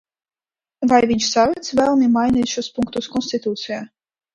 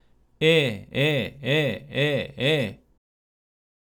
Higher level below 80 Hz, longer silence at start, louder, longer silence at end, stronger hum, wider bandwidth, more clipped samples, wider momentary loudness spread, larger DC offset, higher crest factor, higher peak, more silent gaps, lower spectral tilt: first, -50 dBFS vs -58 dBFS; first, 0.8 s vs 0.4 s; first, -19 LUFS vs -24 LUFS; second, 0.5 s vs 1.2 s; neither; second, 10.5 kHz vs 18.5 kHz; neither; about the same, 9 LU vs 7 LU; neither; about the same, 18 dB vs 18 dB; first, 0 dBFS vs -8 dBFS; neither; second, -4 dB/octave vs -5.5 dB/octave